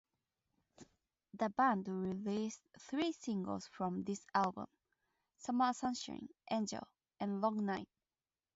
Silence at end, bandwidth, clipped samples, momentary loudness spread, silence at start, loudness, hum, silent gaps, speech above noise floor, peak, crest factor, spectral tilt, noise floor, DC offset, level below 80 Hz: 0.7 s; 7.6 kHz; under 0.1%; 16 LU; 0.8 s; -39 LUFS; none; none; over 51 dB; -20 dBFS; 20 dB; -4.5 dB/octave; under -90 dBFS; under 0.1%; -76 dBFS